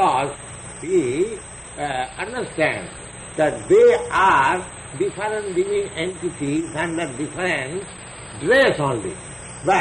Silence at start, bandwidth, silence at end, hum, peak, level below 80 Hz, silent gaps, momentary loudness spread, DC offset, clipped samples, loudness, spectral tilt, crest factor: 0 s; 10 kHz; 0 s; none; -6 dBFS; -48 dBFS; none; 18 LU; under 0.1%; under 0.1%; -21 LUFS; -4.5 dB/octave; 14 dB